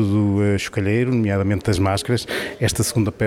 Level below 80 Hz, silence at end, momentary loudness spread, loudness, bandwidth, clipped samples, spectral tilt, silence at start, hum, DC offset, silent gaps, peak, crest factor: -44 dBFS; 0 s; 4 LU; -20 LUFS; 16.5 kHz; under 0.1%; -5.5 dB/octave; 0 s; none; under 0.1%; none; -4 dBFS; 14 dB